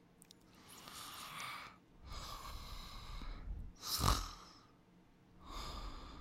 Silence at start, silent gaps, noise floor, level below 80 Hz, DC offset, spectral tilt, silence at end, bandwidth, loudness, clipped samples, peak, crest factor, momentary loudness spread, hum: 0 s; none; -66 dBFS; -50 dBFS; under 0.1%; -3 dB/octave; 0 s; 16 kHz; -45 LUFS; under 0.1%; -16 dBFS; 30 dB; 24 LU; none